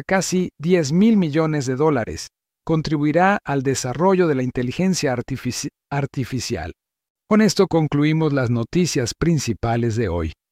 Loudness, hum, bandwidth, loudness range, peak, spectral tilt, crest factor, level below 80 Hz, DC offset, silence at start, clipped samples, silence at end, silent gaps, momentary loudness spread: -20 LUFS; none; 15.5 kHz; 3 LU; -4 dBFS; -5.5 dB/octave; 14 dB; -44 dBFS; under 0.1%; 0 s; under 0.1%; 0.2 s; 7.10-7.15 s; 10 LU